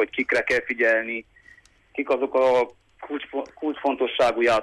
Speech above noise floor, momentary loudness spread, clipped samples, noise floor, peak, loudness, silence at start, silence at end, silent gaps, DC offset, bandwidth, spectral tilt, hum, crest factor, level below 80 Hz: 31 dB; 13 LU; under 0.1%; -54 dBFS; -10 dBFS; -23 LUFS; 0 s; 0 s; none; under 0.1%; 12 kHz; -4 dB/octave; none; 14 dB; -60 dBFS